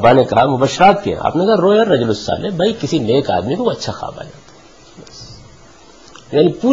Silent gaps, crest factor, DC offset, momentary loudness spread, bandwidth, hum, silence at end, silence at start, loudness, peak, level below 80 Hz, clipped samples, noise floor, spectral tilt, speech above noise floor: none; 16 dB; 0.3%; 18 LU; 7.8 kHz; none; 0 s; 0 s; -14 LUFS; 0 dBFS; -44 dBFS; under 0.1%; -43 dBFS; -6 dB/octave; 29 dB